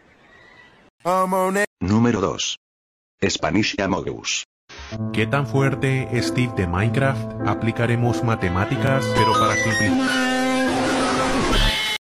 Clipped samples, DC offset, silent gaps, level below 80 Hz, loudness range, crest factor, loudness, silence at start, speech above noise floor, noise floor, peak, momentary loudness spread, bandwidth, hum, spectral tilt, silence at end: under 0.1%; under 0.1%; 1.67-1.77 s, 2.57-3.18 s, 4.45-4.68 s; -36 dBFS; 4 LU; 16 dB; -21 LUFS; 1.05 s; 30 dB; -50 dBFS; -6 dBFS; 7 LU; 15.5 kHz; none; -5 dB/octave; 0.2 s